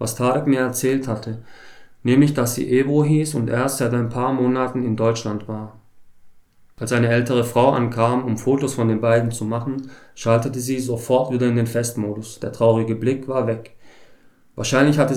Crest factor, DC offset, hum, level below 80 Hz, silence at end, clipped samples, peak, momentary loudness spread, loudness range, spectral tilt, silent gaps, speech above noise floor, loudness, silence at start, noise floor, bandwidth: 18 dB; under 0.1%; none; -58 dBFS; 0 s; under 0.1%; -2 dBFS; 12 LU; 3 LU; -6 dB/octave; none; 30 dB; -20 LUFS; 0 s; -50 dBFS; 16.5 kHz